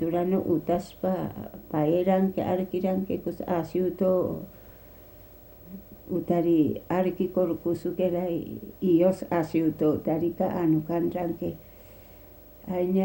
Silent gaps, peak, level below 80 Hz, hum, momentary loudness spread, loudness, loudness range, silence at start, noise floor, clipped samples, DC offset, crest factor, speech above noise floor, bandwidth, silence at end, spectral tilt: none; -10 dBFS; -56 dBFS; none; 12 LU; -27 LUFS; 3 LU; 0 s; -49 dBFS; under 0.1%; under 0.1%; 16 dB; 23 dB; 16 kHz; 0 s; -9 dB/octave